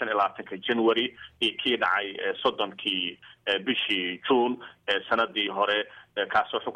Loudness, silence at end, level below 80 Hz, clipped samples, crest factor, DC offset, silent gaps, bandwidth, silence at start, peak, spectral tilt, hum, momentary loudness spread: -27 LUFS; 0 s; -68 dBFS; under 0.1%; 18 dB; under 0.1%; none; 10 kHz; 0 s; -10 dBFS; -4.5 dB/octave; none; 7 LU